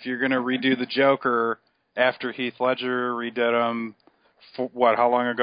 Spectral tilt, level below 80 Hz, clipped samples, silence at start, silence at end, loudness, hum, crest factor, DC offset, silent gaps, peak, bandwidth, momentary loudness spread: -9.5 dB/octave; -74 dBFS; under 0.1%; 0 s; 0 s; -23 LUFS; none; 18 dB; under 0.1%; none; -6 dBFS; 5.2 kHz; 12 LU